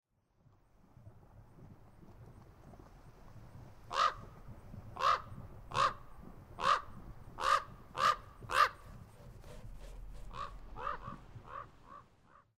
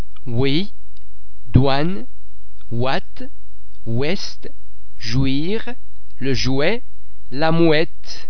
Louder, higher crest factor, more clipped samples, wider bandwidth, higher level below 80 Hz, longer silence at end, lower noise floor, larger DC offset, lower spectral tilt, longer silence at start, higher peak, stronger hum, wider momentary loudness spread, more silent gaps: second, -35 LUFS vs -21 LUFS; about the same, 24 dB vs 24 dB; neither; first, 16 kHz vs 5.4 kHz; second, -56 dBFS vs -38 dBFS; first, 0.55 s vs 0.05 s; first, -70 dBFS vs -47 dBFS; second, under 0.1% vs 20%; second, -3 dB/octave vs -6.5 dB/octave; first, 1 s vs 0.15 s; second, -14 dBFS vs 0 dBFS; neither; first, 25 LU vs 21 LU; neither